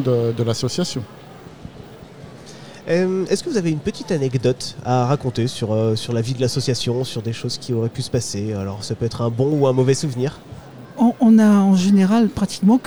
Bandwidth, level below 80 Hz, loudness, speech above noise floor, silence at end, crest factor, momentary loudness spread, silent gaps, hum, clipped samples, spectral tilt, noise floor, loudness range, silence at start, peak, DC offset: over 20 kHz; -50 dBFS; -19 LUFS; 21 dB; 0 s; 14 dB; 24 LU; none; none; under 0.1%; -6.5 dB/octave; -39 dBFS; 8 LU; 0 s; -4 dBFS; 0.5%